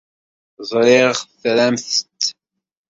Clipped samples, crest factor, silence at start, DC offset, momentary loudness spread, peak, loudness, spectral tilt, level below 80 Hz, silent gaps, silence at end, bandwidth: under 0.1%; 18 dB; 0.6 s; under 0.1%; 10 LU; -2 dBFS; -17 LUFS; -3 dB/octave; -64 dBFS; none; 0.6 s; 7.8 kHz